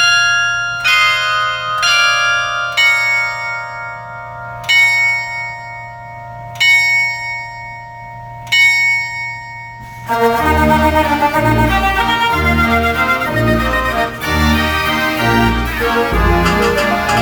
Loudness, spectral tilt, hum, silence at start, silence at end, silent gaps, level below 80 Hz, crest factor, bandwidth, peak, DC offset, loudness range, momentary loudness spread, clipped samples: -12 LUFS; -4 dB/octave; none; 0 s; 0 s; none; -28 dBFS; 14 dB; over 20 kHz; 0 dBFS; under 0.1%; 3 LU; 18 LU; under 0.1%